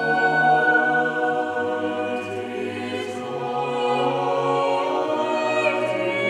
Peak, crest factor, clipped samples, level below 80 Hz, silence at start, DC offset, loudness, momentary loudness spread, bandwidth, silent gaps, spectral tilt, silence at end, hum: -6 dBFS; 16 dB; under 0.1%; -74 dBFS; 0 s; under 0.1%; -22 LUFS; 11 LU; 11.5 kHz; none; -5 dB/octave; 0 s; none